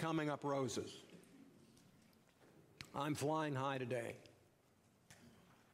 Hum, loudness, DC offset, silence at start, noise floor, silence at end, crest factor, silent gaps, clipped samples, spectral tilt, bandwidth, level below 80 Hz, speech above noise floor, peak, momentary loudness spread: none; -42 LUFS; under 0.1%; 0 s; -73 dBFS; 0.45 s; 18 dB; none; under 0.1%; -5.5 dB/octave; 15.5 kHz; -82 dBFS; 31 dB; -26 dBFS; 24 LU